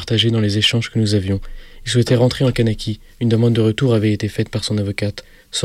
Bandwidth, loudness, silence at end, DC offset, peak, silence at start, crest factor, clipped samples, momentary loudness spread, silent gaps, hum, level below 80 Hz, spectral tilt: 13.5 kHz; -18 LUFS; 0 s; under 0.1%; -4 dBFS; 0 s; 14 dB; under 0.1%; 10 LU; none; none; -38 dBFS; -5.5 dB/octave